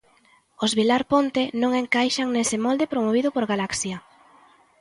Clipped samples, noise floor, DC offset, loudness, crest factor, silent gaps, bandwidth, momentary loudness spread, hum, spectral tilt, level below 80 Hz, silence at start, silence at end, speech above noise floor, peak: under 0.1%; -59 dBFS; under 0.1%; -23 LUFS; 18 dB; none; 11.5 kHz; 6 LU; none; -3.5 dB/octave; -60 dBFS; 0.6 s; 0.8 s; 37 dB; -6 dBFS